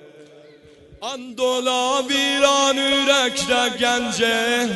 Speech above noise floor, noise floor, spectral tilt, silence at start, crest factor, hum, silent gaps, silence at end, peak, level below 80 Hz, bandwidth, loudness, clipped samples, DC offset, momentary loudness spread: 28 dB; -47 dBFS; -1.5 dB/octave; 0.05 s; 16 dB; none; none; 0 s; -4 dBFS; -56 dBFS; 12 kHz; -18 LUFS; under 0.1%; under 0.1%; 10 LU